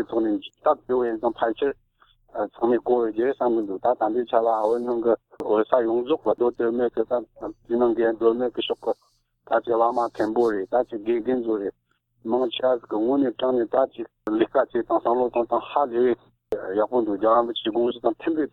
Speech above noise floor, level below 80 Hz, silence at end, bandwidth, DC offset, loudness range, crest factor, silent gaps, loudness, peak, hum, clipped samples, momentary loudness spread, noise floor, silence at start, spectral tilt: 37 dB; -60 dBFS; 0.05 s; 5.4 kHz; under 0.1%; 2 LU; 20 dB; none; -24 LUFS; -4 dBFS; none; under 0.1%; 7 LU; -60 dBFS; 0 s; -7 dB/octave